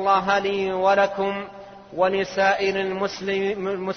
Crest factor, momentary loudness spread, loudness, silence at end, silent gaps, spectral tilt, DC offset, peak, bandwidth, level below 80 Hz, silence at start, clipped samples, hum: 16 dB; 10 LU; -22 LUFS; 0 s; none; -5 dB/octave; under 0.1%; -6 dBFS; 6.6 kHz; -58 dBFS; 0 s; under 0.1%; none